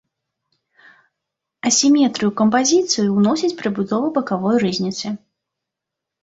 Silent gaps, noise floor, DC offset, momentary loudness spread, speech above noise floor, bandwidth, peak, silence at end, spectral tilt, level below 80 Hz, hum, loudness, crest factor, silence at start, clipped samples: none; -83 dBFS; under 0.1%; 10 LU; 66 dB; 8 kHz; -2 dBFS; 1.05 s; -4 dB/octave; -62 dBFS; none; -18 LUFS; 16 dB; 1.65 s; under 0.1%